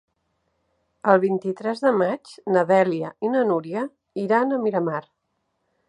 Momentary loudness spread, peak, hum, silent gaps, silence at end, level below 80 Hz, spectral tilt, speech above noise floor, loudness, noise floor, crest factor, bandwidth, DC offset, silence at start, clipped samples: 11 LU; -2 dBFS; none; none; 0.9 s; -74 dBFS; -7.5 dB/octave; 53 dB; -22 LUFS; -74 dBFS; 22 dB; 10.5 kHz; under 0.1%; 1.05 s; under 0.1%